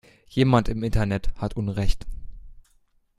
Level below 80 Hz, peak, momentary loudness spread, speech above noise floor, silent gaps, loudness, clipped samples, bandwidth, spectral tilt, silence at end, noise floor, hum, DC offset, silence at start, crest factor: -32 dBFS; -2 dBFS; 14 LU; 41 dB; none; -25 LUFS; under 0.1%; 11.5 kHz; -7.5 dB/octave; 0.6 s; -63 dBFS; none; under 0.1%; 0.35 s; 22 dB